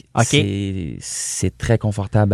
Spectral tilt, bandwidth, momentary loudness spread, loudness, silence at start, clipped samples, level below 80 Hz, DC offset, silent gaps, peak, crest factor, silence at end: -5 dB/octave; 13.5 kHz; 9 LU; -20 LUFS; 0.15 s; under 0.1%; -42 dBFS; under 0.1%; none; 0 dBFS; 18 dB; 0 s